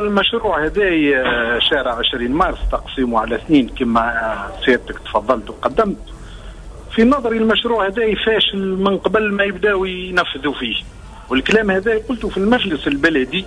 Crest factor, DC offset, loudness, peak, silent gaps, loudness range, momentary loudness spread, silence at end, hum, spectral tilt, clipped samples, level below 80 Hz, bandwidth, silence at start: 14 dB; under 0.1%; -17 LUFS; -2 dBFS; none; 2 LU; 7 LU; 0 s; none; -5.5 dB/octave; under 0.1%; -34 dBFS; 10.5 kHz; 0 s